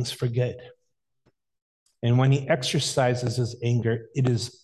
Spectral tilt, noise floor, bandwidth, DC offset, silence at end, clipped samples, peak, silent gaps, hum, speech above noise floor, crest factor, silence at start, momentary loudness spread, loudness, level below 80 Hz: -5.5 dB/octave; -75 dBFS; 12.5 kHz; under 0.1%; 0.15 s; under 0.1%; -8 dBFS; 1.62-1.86 s; none; 51 dB; 16 dB; 0 s; 7 LU; -25 LUFS; -58 dBFS